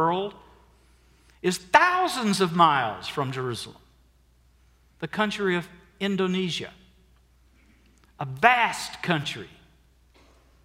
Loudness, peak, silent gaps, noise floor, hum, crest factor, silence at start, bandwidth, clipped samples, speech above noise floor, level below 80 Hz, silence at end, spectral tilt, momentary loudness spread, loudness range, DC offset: -24 LUFS; 0 dBFS; none; -60 dBFS; none; 26 dB; 0 s; 16 kHz; under 0.1%; 36 dB; -60 dBFS; 1.15 s; -4.5 dB/octave; 18 LU; 6 LU; under 0.1%